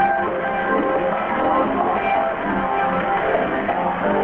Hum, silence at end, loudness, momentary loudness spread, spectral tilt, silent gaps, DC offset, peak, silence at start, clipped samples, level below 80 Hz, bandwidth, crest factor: none; 0 s; -20 LUFS; 3 LU; -8.5 dB/octave; none; under 0.1%; -6 dBFS; 0 s; under 0.1%; -46 dBFS; 4.6 kHz; 14 dB